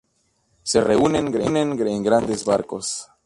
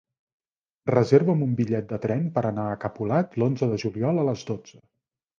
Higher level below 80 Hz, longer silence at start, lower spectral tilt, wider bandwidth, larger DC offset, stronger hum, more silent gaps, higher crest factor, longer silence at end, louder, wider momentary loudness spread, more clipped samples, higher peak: first, -50 dBFS vs -60 dBFS; second, 0.65 s vs 0.85 s; second, -4.5 dB/octave vs -8.5 dB/octave; first, 11.5 kHz vs 7.4 kHz; neither; neither; neither; about the same, 18 dB vs 20 dB; second, 0.2 s vs 0.7 s; first, -21 LUFS vs -25 LUFS; about the same, 9 LU vs 11 LU; neither; about the same, -4 dBFS vs -4 dBFS